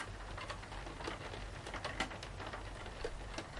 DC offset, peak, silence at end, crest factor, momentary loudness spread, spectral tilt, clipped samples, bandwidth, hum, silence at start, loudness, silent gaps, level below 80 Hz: under 0.1%; -24 dBFS; 0 s; 20 dB; 5 LU; -4 dB/octave; under 0.1%; 11.5 kHz; none; 0 s; -45 LUFS; none; -52 dBFS